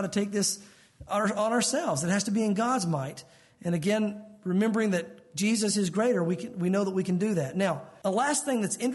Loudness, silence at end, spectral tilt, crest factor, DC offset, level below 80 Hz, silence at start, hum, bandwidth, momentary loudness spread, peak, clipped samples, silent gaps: -28 LUFS; 0 s; -4.5 dB/octave; 12 dB; under 0.1%; -66 dBFS; 0 s; none; 11.5 kHz; 7 LU; -16 dBFS; under 0.1%; none